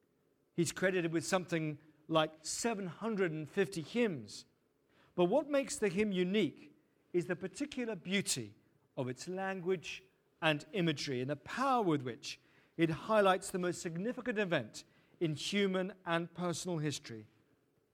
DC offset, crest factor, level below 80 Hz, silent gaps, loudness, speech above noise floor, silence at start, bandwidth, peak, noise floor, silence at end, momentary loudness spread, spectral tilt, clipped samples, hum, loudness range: under 0.1%; 22 dB; -74 dBFS; none; -36 LUFS; 40 dB; 0.55 s; 16 kHz; -14 dBFS; -75 dBFS; 0.7 s; 13 LU; -4.5 dB/octave; under 0.1%; none; 4 LU